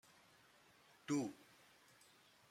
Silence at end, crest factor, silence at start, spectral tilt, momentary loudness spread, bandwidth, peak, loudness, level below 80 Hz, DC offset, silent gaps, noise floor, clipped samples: 1.15 s; 22 dB; 1.1 s; -5 dB/octave; 25 LU; 16 kHz; -28 dBFS; -45 LUFS; -90 dBFS; under 0.1%; none; -70 dBFS; under 0.1%